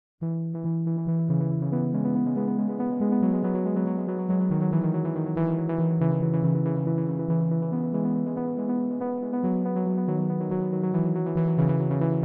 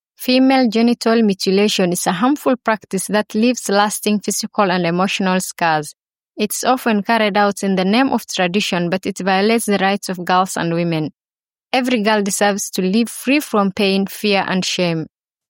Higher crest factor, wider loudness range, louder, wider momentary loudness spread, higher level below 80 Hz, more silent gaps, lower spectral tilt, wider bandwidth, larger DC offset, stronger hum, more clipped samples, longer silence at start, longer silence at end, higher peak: about the same, 12 dB vs 16 dB; about the same, 2 LU vs 2 LU; second, -26 LUFS vs -17 LUFS; about the same, 4 LU vs 5 LU; about the same, -60 dBFS vs -64 dBFS; neither; first, -14 dB/octave vs -4.5 dB/octave; second, 2.9 kHz vs 17 kHz; neither; neither; neither; about the same, 0.2 s vs 0.2 s; second, 0 s vs 0.45 s; second, -12 dBFS vs -2 dBFS